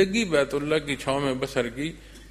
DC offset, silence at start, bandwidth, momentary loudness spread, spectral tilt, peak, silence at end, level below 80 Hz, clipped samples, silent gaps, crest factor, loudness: under 0.1%; 0 s; 14.5 kHz; 10 LU; -4.5 dB/octave; -8 dBFS; 0 s; -48 dBFS; under 0.1%; none; 18 dB; -26 LUFS